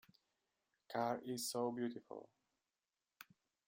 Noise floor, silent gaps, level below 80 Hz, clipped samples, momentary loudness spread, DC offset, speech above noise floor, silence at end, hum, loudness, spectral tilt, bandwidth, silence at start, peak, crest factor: under -90 dBFS; none; -90 dBFS; under 0.1%; 21 LU; under 0.1%; over 47 dB; 0.45 s; none; -43 LUFS; -4 dB/octave; 16 kHz; 0.9 s; -26 dBFS; 20 dB